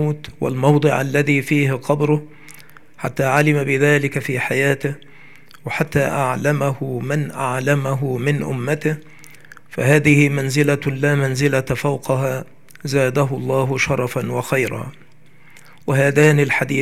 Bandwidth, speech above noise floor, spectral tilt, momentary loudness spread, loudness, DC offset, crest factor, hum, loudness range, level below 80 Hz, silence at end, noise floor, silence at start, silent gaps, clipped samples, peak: 15.5 kHz; 32 dB; -6 dB/octave; 10 LU; -18 LUFS; 0.8%; 18 dB; none; 3 LU; -54 dBFS; 0 s; -50 dBFS; 0 s; none; under 0.1%; 0 dBFS